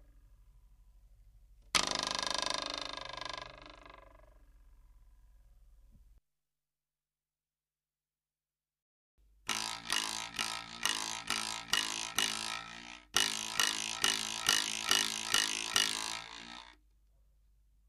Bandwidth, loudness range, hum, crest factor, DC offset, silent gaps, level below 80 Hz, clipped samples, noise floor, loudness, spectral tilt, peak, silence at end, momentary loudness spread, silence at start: 15 kHz; 14 LU; none; 30 dB; under 0.1%; 8.82-9.18 s; -64 dBFS; under 0.1%; under -90 dBFS; -33 LUFS; 0.5 dB/octave; -8 dBFS; 1.15 s; 15 LU; 0 s